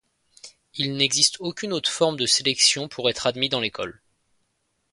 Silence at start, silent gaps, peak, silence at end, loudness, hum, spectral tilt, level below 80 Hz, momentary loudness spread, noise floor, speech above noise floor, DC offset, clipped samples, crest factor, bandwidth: 0.45 s; none; -2 dBFS; 1 s; -21 LUFS; none; -2 dB/octave; -64 dBFS; 11 LU; -73 dBFS; 49 dB; under 0.1%; under 0.1%; 24 dB; 11.5 kHz